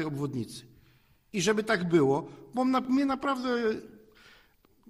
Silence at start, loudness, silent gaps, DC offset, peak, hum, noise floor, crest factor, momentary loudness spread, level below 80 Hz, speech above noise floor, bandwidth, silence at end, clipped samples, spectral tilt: 0 s; -29 LUFS; none; under 0.1%; -12 dBFS; none; -63 dBFS; 18 dB; 13 LU; -64 dBFS; 35 dB; 15.5 kHz; 1 s; under 0.1%; -5.5 dB/octave